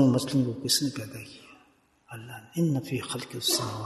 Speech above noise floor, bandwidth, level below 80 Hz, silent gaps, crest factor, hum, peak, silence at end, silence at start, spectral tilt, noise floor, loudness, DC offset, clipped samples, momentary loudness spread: 34 dB; 12.5 kHz; -66 dBFS; none; 20 dB; none; -10 dBFS; 0 s; 0 s; -4.5 dB/octave; -63 dBFS; -28 LUFS; under 0.1%; under 0.1%; 19 LU